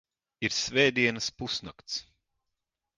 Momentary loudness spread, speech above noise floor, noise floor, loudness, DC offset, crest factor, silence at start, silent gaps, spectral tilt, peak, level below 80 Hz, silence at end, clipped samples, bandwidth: 13 LU; 56 dB; -85 dBFS; -28 LUFS; under 0.1%; 22 dB; 0.4 s; none; -3 dB/octave; -10 dBFS; -62 dBFS; 0.95 s; under 0.1%; 10 kHz